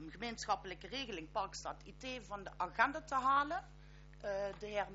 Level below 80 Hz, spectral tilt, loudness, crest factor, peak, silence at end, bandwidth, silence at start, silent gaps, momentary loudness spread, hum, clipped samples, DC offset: -60 dBFS; -1.5 dB/octave; -40 LUFS; 24 dB; -18 dBFS; 0 s; 7.6 kHz; 0 s; none; 15 LU; none; under 0.1%; under 0.1%